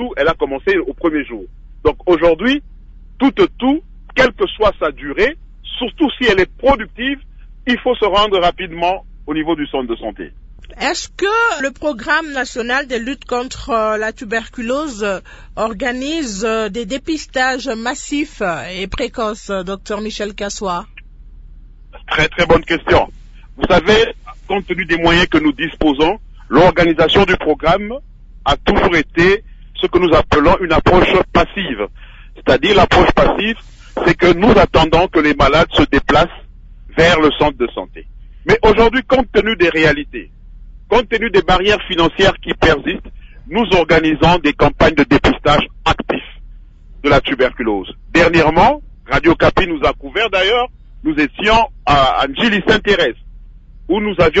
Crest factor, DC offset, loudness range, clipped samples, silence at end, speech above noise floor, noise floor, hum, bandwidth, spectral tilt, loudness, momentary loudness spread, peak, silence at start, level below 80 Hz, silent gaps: 14 dB; under 0.1%; 7 LU; under 0.1%; 0 s; 23 dB; -37 dBFS; none; 8 kHz; -5 dB/octave; -14 LUFS; 12 LU; 0 dBFS; 0 s; -30 dBFS; none